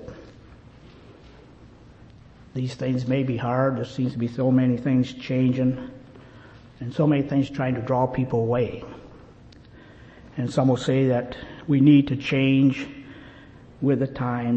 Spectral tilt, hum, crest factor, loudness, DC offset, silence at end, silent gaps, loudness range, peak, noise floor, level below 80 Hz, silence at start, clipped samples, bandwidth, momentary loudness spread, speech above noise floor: -8 dB/octave; none; 18 dB; -23 LUFS; under 0.1%; 0 s; none; 6 LU; -6 dBFS; -48 dBFS; -52 dBFS; 0 s; under 0.1%; 8.4 kHz; 18 LU; 26 dB